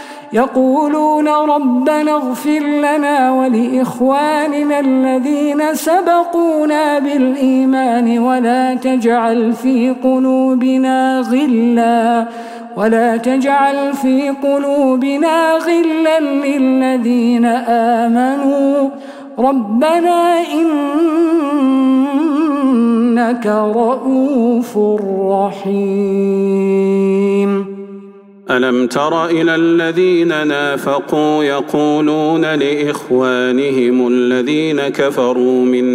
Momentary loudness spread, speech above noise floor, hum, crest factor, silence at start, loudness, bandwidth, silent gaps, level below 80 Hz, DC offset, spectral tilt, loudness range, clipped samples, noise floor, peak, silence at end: 3 LU; 24 dB; none; 12 dB; 0 s; -13 LUFS; 16 kHz; none; -64 dBFS; under 0.1%; -6 dB/octave; 1 LU; under 0.1%; -36 dBFS; -2 dBFS; 0 s